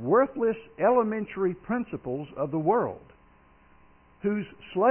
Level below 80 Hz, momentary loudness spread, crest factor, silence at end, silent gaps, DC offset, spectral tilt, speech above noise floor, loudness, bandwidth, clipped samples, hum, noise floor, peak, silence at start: -62 dBFS; 11 LU; 16 dB; 0 s; none; under 0.1%; -11 dB/octave; 32 dB; -28 LUFS; 3.3 kHz; under 0.1%; none; -58 dBFS; -12 dBFS; 0 s